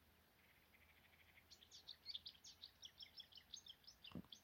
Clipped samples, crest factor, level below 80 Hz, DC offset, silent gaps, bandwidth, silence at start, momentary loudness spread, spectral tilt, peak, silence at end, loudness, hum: under 0.1%; 24 dB; -82 dBFS; under 0.1%; none; 16.5 kHz; 0 s; 13 LU; -2.5 dB/octave; -38 dBFS; 0 s; -58 LUFS; none